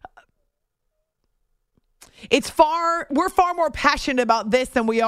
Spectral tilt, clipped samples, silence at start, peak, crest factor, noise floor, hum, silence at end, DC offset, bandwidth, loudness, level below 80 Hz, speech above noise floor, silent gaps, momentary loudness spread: -3.5 dB/octave; under 0.1%; 2.2 s; -2 dBFS; 22 dB; -75 dBFS; none; 0 s; under 0.1%; 15.5 kHz; -20 LUFS; -46 dBFS; 56 dB; none; 4 LU